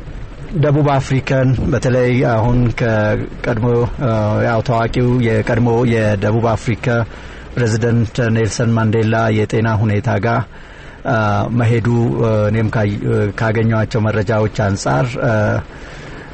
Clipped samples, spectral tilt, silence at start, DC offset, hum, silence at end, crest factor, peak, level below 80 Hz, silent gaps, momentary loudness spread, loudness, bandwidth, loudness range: under 0.1%; -7.5 dB/octave; 0 s; under 0.1%; none; 0 s; 10 dB; -4 dBFS; -32 dBFS; none; 6 LU; -16 LUFS; 8.6 kHz; 1 LU